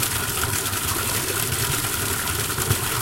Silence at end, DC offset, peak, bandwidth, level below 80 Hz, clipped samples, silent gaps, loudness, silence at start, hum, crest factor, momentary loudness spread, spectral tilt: 0 s; under 0.1%; -4 dBFS; 17 kHz; -40 dBFS; under 0.1%; none; -22 LUFS; 0 s; none; 20 dB; 1 LU; -2.5 dB/octave